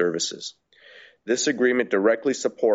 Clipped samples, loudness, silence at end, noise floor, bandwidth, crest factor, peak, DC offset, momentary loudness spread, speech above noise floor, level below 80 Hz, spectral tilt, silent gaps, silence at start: under 0.1%; -23 LUFS; 0 s; -50 dBFS; 8 kHz; 16 dB; -8 dBFS; under 0.1%; 15 LU; 28 dB; -70 dBFS; -2.5 dB/octave; none; 0 s